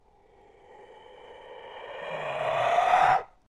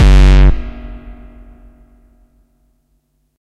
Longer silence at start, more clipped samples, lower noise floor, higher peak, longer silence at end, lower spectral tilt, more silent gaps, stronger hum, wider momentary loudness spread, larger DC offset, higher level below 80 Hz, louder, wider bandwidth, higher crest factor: first, 0.8 s vs 0 s; neither; about the same, -58 dBFS vs -61 dBFS; second, -10 dBFS vs 0 dBFS; second, 0.25 s vs 2.35 s; second, -3.5 dB/octave vs -7 dB/octave; neither; neither; about the same, 25 LU vs 27 LU; neither; second, -62 dBFS vs -14 dBFS; second, -25 LUFS vs -11 LUFS; first, 11.5 kHz vs 8 kHz; first, 20 dB vs 12 dB